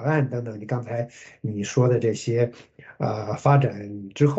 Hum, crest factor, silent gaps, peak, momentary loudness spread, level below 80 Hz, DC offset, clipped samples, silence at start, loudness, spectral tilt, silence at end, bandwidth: none; 18 dB; none; -6 dBFS; 13 LU; -64 dBFS; under 0.1%; under 0.1%; 0 s; -24 LUFS; -7 dB/octave; 0 s; 8 kHz